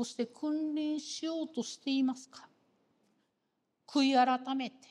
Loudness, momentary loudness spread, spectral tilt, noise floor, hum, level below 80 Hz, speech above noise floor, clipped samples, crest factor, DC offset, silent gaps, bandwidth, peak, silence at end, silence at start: -33 LUFS; 10 LU; -3 dB/octave; -82 dBFS; none; under -90 dBFS; 49 dB; under 0.1%; 20 dB; under 0.1%; none; 11 kHz; -16 dBFS; 0.2 s; 0 s